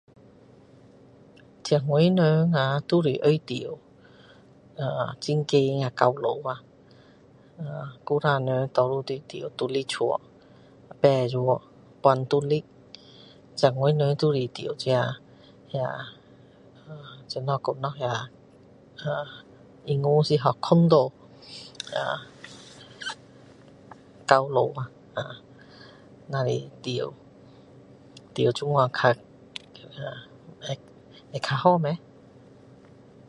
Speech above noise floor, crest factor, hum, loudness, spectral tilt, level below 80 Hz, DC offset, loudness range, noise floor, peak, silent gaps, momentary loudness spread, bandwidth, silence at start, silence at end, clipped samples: 30 dB; 26 dB; none; -25 LUFS; -6.5 dB/octave; -66 dBFS; under 0.1%; 8 LU; -54 dBFS; 0 dBFS; none; 20 LU; 11 kHz; 1.65 s; 1.3 s; under 0.1%